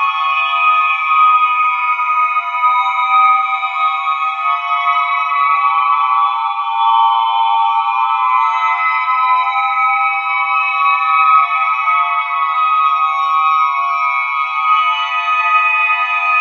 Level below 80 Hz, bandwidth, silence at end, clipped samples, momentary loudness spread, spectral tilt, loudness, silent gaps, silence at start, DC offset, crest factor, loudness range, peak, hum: under -90 dBFS; 6.8 kHz; 0 s; under 0.1%; 4 LU; 5 dB/octave; -13 LUFS; none; 0 s; under 0.1%; 14 dB; 1 LU; 0 dBFS; none